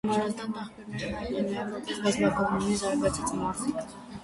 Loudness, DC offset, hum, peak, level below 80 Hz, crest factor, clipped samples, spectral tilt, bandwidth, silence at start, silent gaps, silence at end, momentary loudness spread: -30 LUFS; under 0.1%; none; -12 dBFS; -52 dBFS; 18 dB; under 0.1%; -5 dB/octave; 11.5 kHz; 0.05 s; none; 0 s; 11 LU